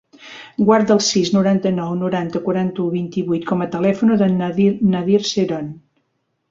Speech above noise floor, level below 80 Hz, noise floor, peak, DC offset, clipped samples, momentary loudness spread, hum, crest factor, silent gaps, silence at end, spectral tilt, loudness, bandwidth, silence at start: 53 dB; -56 dBFS; -70 dBFS; -2 dBFS; under 0.1%; under 0.1%; 7 LU; none; 16 dB; none; 0.75 s; -5.5 dB/octave; -18 LUFS; 7.6 kHz; 0.2 s